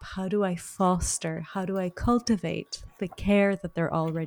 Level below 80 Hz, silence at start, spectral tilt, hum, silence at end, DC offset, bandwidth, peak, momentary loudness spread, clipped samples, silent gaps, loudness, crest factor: -44 dBFS; 0 s; -5.5 dB/octave; none; 0 s; under 0.1%; 19.5 kHz; -12 dBFS; 10 LU; under 0.1%; none; -28 LUFS; 16 dB